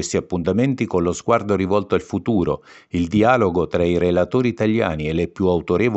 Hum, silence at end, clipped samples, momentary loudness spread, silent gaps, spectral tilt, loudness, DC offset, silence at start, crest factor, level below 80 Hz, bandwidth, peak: none; 0 s; under 0.1%; 5 LU; none; -6.5 dB/octave; -20 LUFS; under 0.1%; 0 s; 18 dB; -44 dBFS; 8.4 kHz; -2 dBFS